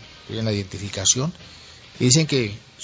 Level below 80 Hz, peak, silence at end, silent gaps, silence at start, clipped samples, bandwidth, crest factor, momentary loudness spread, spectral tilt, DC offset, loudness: -48 dBFS; -2 dBFS; 0 s; none; 0 s; under 0.1%; 8 kHz; 22 dB; 15 LU; -3.5 dB/octave; under 0.1%; -21 LUFS